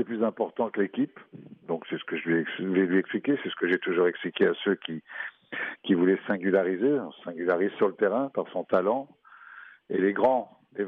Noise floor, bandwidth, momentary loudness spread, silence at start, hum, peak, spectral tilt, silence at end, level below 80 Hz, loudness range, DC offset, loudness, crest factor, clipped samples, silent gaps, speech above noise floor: -49 dBFS; 4.3 kHz; 12 LU; 0 s; none; -10 dBFS; -4.5 dB/octave; 0 s; -76 dBFS; 2 LU; under 0.1%; -27 LUFS; 16 dB; under 0.1%; none; 22 dB